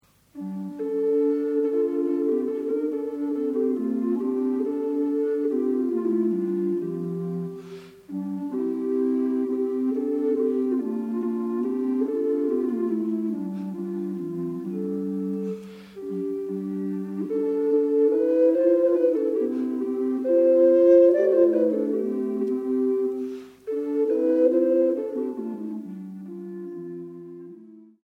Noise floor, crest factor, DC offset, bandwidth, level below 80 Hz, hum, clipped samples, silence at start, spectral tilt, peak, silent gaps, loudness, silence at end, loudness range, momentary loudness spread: -47 dBFS; 16 dB; under 0.1%; 6 kHz; -72 dBFS; 50 Hz at -70 dBFS; under 0.1%; 0.35 s; -9.5 dB/octave; -8 dBFS; none; -24 LUFS; 0.2 s; 9 LU; 15 LU